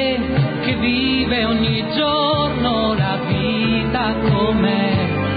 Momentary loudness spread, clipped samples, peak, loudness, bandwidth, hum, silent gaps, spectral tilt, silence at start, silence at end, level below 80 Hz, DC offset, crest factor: 3 LU; under 0.1%; -6 dBFS; -18 LUFS; 5 kHz; none; none; -11.5 dB/octave; 0 s; 0 s; -34 dBFS; under 0.1%; 12 dB